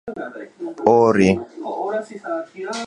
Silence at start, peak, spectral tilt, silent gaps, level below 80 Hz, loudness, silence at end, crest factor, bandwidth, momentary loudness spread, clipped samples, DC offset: 0.05 s; 0 dBFS; -6.5 dB/octave; none; -52 dBFS; -19 LUFS; 0 s; 20 dB; 10.5 kHz; 18 LU; under 0.1%; under 0.1%